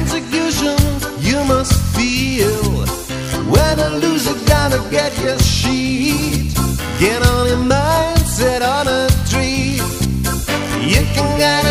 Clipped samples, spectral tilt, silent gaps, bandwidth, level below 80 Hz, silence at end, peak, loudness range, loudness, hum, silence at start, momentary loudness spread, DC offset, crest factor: under 0.1%; -4.5 dB/octave; none; 15.5 kHz; -24 dBFS; 0 s; 0 dBFS; 1 LU; -15 LUFS; none; 0 s; 5 LU; under 0.1%; 14 dB